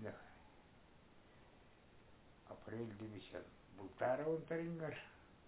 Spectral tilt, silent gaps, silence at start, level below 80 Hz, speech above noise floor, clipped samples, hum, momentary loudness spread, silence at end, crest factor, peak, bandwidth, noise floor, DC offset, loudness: -6 dB/octave; none; 0 s; -72 dBFS; 21 dB; under 0.1%; none; 26 LU; 0 s; 22 dB; -28 dBFS; 4 kHz; -66 dBFS; under 0.1%; -46 LUFS